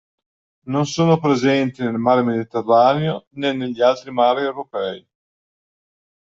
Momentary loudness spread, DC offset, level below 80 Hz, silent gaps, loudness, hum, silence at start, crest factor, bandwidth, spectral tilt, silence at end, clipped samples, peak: 10 LU; under 0.1%; -62 dBFS; 3.27-3.31 s; -19 LUFS; none; 0.65 s; 18 dB; 7.8 kHz; -6.5 dB/octave; 1.35 s; under 0.1%; -2 dBFS